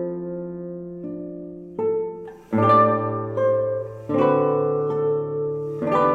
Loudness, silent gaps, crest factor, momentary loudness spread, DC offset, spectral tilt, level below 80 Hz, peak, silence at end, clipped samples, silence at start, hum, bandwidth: -22 LUFS; none; 18 dB; 16 LU; under 0.1%; -9.5 dB/octave; -60 dBFS; -6 dBFS; 0 s; under 0.1%; 0 s; none; 7.2 kHz